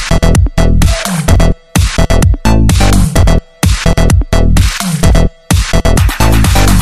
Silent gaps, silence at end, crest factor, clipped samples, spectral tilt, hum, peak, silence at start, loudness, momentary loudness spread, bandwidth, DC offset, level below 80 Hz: none; 0 s; 8 dB; 0.3%; -5 dB/octave; none; 0 dBFS; 0 s; -10 LUFS; 4 LU; 15.5 kHz; 10%; -12 dBFS